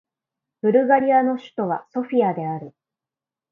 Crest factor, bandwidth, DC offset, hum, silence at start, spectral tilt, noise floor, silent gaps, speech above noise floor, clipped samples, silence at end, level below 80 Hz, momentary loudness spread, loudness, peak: 20 dB; 4.1 kHz; under 0.1%; none; 0.65 s; -9 dB/octave; -90 dBFS; none; 70 dB; under 0.1%; 0.8 s; -72 dBFS; 11 LU; -21 LUFS; -4 dBFS